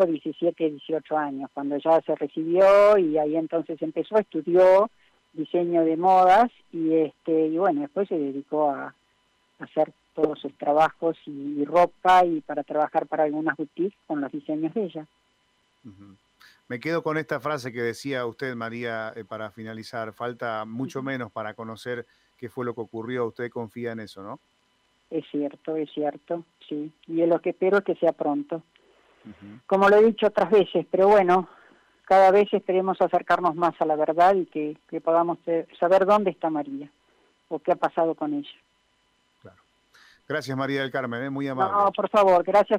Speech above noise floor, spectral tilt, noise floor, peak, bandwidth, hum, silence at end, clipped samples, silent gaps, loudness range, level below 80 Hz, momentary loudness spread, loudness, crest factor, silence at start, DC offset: 44 dB; -6.5 dB/octave; -68 dBFS; -10 dBFS; 12.5 kHz; none; 0 s; under 0.1%; none; 12 LU; -66 dBFS; 16 LU; -24 LUFS; 14 dB; 0 s; under 0.1%